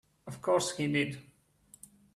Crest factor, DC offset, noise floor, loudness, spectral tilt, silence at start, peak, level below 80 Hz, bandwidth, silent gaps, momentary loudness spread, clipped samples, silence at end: 20 dB; under 0.1%; -62 dBFS; -31 LUFS; -4.5 dB/octave; 0.25 s; -14 dBFS; -72 dBFS; 15 kHz; none; 22 LU; under 0.1%; 0.95 s